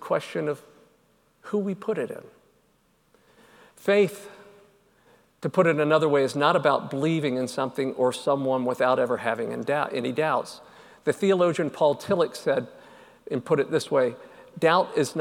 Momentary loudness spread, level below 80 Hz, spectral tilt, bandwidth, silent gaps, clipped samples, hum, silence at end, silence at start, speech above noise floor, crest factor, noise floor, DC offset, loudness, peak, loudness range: 11 LU; -72 dBFS; -5.5 dB/octave; 17 kHz; none; under 0.1%; none; 0 s; 0 s; 41 dB; 20 dB; -65 dBFS; under 0.1%; -25 LUFS; -6 dBFS; 7 LU